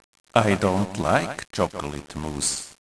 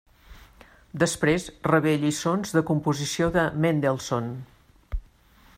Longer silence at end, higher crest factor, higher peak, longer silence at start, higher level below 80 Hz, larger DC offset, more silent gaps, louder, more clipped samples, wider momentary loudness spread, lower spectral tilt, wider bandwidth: second, 0.1 s vs 0.55 s; about the same, 24 dB vs 20 dB; first, -2 dBFS vs -6 dBFS; about the same, 0.35 s vs 0.3 s; about the same, -46 dBFS vs -44 dBFS; first, 0.2% vs under 0.1%; neither; about the same, -24 LUFS vs -24 LUFS; neither; second, 12 LU vs 17 LU; about the same, -4.5 dB/octave vs -5.5 dB/octave; second, 11 kHz vs 15.5 kHz